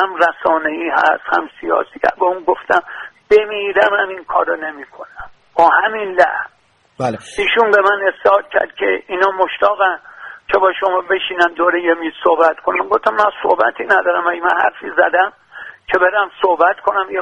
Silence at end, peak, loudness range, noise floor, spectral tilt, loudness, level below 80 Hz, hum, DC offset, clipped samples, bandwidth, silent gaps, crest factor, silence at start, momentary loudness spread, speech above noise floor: 0 s; 0 dBFS; 2 LU; -34 dBFS; -4.5 dB/octave; -15 LUFS; -54 dBFS; none; under 0.1%; under 0.1%; 11 kHz; none; 16 dB; 0 s; 10 LU; 19 dB